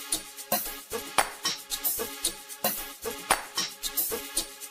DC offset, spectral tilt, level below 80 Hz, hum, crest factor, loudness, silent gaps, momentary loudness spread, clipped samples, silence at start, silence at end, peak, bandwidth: under 0.1%; 0 dB/octave; -54 dBFS; none; 26 dB; -29 LUFS; none; 6 LU; under 0.1%; 0 s; 0 s; -6 dBFS; 16 kHz